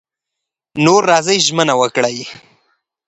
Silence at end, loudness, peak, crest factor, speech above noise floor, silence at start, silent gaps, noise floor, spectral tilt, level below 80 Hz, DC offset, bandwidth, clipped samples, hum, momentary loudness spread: 0.75 s; -13 LUFS; 0 dBFS; 16 dB; 67 dB; 0.75 s; none; -81 dBFS; -3.5 dB/octave; -60 dBFS; under 0.1%; 9 kHz; under 0.1%; none; 16 LU